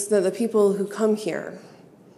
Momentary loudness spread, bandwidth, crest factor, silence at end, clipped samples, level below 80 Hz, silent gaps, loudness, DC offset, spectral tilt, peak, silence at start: 15 LU; 13.5 kHz; 16 dB; 0.4 s; under 0.1%; -80 dBFS; none; -23 LUFS; under 0.1%; -5.5 dB/octave; -8 dBFS; 0 s